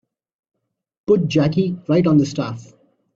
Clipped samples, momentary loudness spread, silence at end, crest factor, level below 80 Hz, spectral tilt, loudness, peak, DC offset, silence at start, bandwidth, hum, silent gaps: under 0.1%; 14 LU; 0.55 s; 16 dB; -54 dBFS; -7.5 dB/octave; -18 LUFS; -4 dBFS; under 0.1%; 1.1 s; 7.6 kHz; none; none